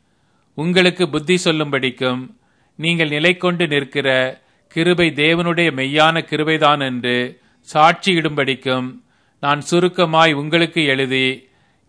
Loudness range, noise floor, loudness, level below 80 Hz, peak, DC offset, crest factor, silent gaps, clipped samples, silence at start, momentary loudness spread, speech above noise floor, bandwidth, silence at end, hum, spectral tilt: 2 LU; -61 dBFS; -16 LUFS; -58 dBFS; 0 dBFS; under 0.1%; 18 dB; none; under 0.1%; 0.55 s; 8 LU; 44 dB; 10.5 kHz; 0.5 s; none; -5 dB/octave